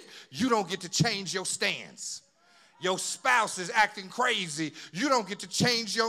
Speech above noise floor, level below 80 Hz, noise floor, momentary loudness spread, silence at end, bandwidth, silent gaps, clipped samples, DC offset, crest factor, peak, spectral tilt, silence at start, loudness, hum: 33 dB; -72 dBFS; -61 dBFS; 10 LU; 0 s; 17 kHz; none; under 0.1%; under 0.1%; 20 dB; -10 dBFS; -3 dB/octave; 0 s; -28 LUFS; none